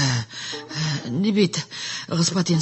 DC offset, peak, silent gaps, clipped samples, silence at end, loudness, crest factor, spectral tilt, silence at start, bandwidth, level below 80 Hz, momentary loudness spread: under 0.1%; -6 dBFS; none; under 0.1%; 0 s; -23 LUFS; 18 dB; -4.5 dB/octave; 0 s; 8.6 kHz; -58 dBFS; 9 LU